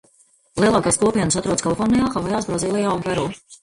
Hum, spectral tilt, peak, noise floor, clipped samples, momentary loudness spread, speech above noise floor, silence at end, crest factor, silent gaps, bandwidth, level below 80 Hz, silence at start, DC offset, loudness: none; -4.5 dB/octave; -4 dBFS; -57 dBFS; under 0.1%; 6 LU; 38 dB; 0.05 s; 16 dB; none; 11.5 kHz; -44 dBFS; 0.55 s; under 0.1%; -20 LUFS